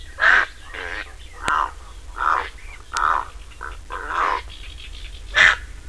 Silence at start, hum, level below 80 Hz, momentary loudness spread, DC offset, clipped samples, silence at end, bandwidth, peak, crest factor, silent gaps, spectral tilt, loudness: 0 s; none; -38 dBFS; 22 LU; 0.7%; under 0.1%; 0 s; 11 kHz; 0 dBFS; 24 dB; none; -1.5 dB/octave; -20 LUFS